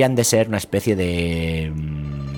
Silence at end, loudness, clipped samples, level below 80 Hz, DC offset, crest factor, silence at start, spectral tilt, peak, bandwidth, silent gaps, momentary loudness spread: 0 s; -21 LUFS; under 0.1%; -36 dBFS; under 0.1%; 18 dB; 0 s; -5 dB/octave; -4 dBFS; 18 kHz; none; 10 LU